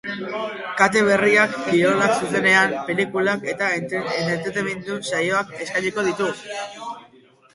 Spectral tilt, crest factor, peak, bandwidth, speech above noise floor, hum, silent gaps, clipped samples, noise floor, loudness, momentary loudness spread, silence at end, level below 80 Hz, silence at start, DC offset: -4.5 dB/octave; 20 dB; 0 dBFS; 11.5 kHz; 31 dB; none; none; under 0.1%; -52 dBFS; -20 LUFS; 13 LU; 0.5 s; -62 dBFS; 0.05 s; under 0.1%